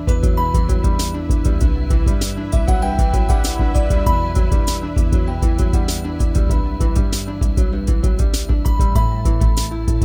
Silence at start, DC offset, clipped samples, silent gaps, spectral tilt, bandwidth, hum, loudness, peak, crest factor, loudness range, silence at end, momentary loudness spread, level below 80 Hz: 0 s; under 0.1%; under 0.1%; none; -6 dB/octave; 16 kHz; none; -18 LUFS; -2 dBFS; 12 dB; 1 LU; 0 s; 3 LU; -16 dBFS